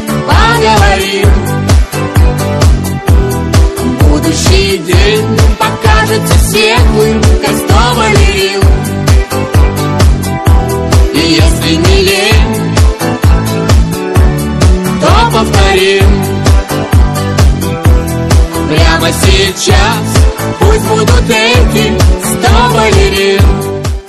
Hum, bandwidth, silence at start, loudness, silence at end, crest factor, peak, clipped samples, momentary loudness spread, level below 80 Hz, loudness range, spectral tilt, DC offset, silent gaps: none; 13 kHz; 0 s; -8 LUFS; 0 s; 8 dB; 0 dBFS; 0.2%; 4 LU; -12 dBFS; 1 LU; -5 dB/octave; under 0.1%; none